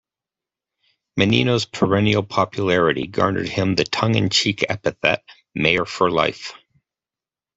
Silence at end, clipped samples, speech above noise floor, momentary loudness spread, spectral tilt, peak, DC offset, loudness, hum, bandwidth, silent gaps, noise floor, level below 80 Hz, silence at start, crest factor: 1.05 s; under 0.1%; over 71 dB; 6 LU; -5 dB/octave; -2 dBFS; under 0.1%; -19 LUFS; none; 8 kHz; none; under -90 dBFS; -52 dBFS; 1.15 s; 20 dB